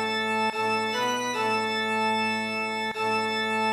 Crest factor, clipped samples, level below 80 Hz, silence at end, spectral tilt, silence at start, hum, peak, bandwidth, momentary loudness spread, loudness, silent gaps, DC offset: 12 dB; under 0.1%; -72 dBFS; 0 s; -3 dB/octave; 0 s; none; -14 dBFS; 14 kHz; 3 LU; -26 LUFS; none; under 0.1%